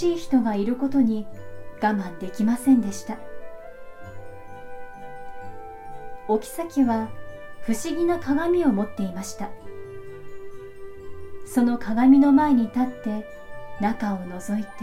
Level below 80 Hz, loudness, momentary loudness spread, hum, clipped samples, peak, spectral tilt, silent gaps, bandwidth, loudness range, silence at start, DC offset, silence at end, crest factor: -50 dBFS; -23 LUFS; 22 LU; none; under 0.1%; -6 dBFS; -6 dB/octave; none; 15 kHz; 8 LU; 0 s; under 0.1%; 0 s; 18 dB